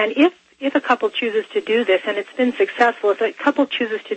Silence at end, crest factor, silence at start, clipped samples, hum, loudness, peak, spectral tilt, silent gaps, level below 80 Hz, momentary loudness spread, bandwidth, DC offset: 0 s; 16 dB; 0 s; under 0.1%; none; -19 LUFS; -2 dBFS; -4.5 dB/octave; none; -70 dBFS; 5 LU; 8.4 kHz; under 0.1%